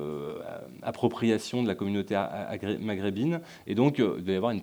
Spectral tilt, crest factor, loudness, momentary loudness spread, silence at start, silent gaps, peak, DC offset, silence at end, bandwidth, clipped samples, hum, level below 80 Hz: -7 dB/octave; 20 dB; -30 LUFS; 11 LU; 0 s; none; -10 dBFS; under 0.1%; 0 s; over 20 kHz; under 0.1%; none; -68 dBFS